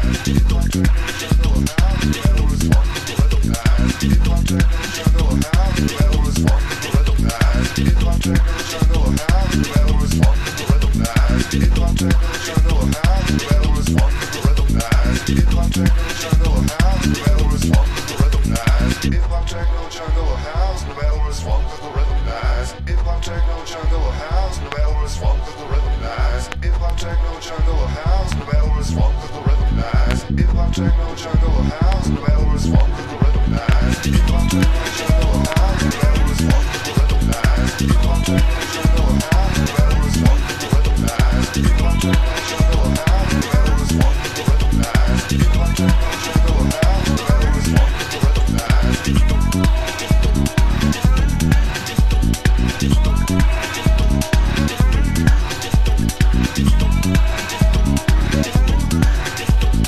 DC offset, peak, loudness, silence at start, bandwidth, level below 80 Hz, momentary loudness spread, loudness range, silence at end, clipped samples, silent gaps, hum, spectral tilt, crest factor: under 0.1%; 0 dBFS; -18 LUFS; 0 s; 14 kHz; -16 dBFS; 5 LU; 5 LU; 0 s; under 0.1%; none; none; -5.5 dB/octave; 14 dB